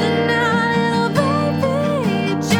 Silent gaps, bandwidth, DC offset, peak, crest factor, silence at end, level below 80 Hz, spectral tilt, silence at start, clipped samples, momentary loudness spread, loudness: none; over 20 kHz; under 0.1%; -2 dBFS; 14 dB; 0 s; -56 dBFS; -6 dB/octave; 0 s; under 0.1%; 3 LU; -17 LUFS